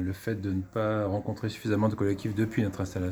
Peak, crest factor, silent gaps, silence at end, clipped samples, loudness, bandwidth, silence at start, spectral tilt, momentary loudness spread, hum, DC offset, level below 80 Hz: -12 dBFS; 18 dB; none; 0 s; under 0.1%; -30 LUFS; over 20 kHz; 0 s; -7.5 dB/octave; 5 LU; none; under 0.1%; -56 dBFS